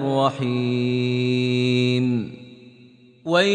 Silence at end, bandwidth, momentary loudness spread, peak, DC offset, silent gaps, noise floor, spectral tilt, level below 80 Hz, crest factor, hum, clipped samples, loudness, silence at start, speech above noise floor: 0 s; 9.6 kHz; 11 LU; -4 dBFS; under 0.1%; none; -50 dBFS; -6.5 dB/octave; -64 dBFS; 16 dB; none; under 0.1%; -21 LUFS; 0 s; 30 dB